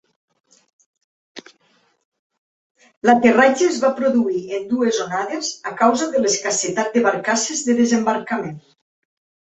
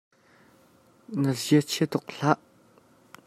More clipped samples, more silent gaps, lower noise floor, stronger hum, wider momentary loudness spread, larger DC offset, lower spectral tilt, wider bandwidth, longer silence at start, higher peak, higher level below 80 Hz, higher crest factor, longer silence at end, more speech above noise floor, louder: neither; first, 2.05-2.12 s, 2.19-2.30 s, 2.38-2.75 s, 2.97-3.02 s vs none; about the same, -61 dBFS vs -59 dBFS; neither; first, 10 LU vs 6 LU; neither; second, -3 dB/octave vs -5.5 dB/octave; second, 8.4 kHz vs 15.5 kHz; first, 1.35 s vs 1.1 s; first, -2 dBFS vs -6 dBFS; first, -66 dBFS vs -72 dBFS; second, 18 dB vs 24 dB; about the same, 0.95 s vs 0.9 s; first, 43 dB vs 35 dB; first, -18 LUFS vs -26 LUFS